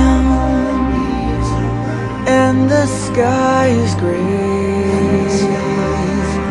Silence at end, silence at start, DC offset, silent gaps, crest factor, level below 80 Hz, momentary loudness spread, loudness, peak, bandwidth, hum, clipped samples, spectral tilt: 0 s; 0 s; under 0.1%; none; 14 dB; -26 dBFS; 5 LU; -15 LUFS; 0 dBFS; 11 kHz; none; under 0.1%; -6.5 dB/octave